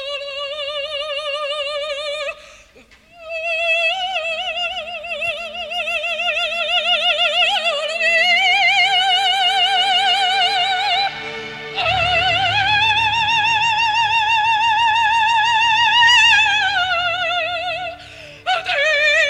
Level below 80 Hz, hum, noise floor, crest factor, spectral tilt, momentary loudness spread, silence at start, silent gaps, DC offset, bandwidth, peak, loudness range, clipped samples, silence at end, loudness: -50 dBFS; none; -48 dBFS; 16 dB; -0.5 dB/octave; 12 LU; 0 s; none; under 0.1%; 13.5 kHz; -2 dBFS; 8 LU; under 0.1%; 0 s; -16 LUFS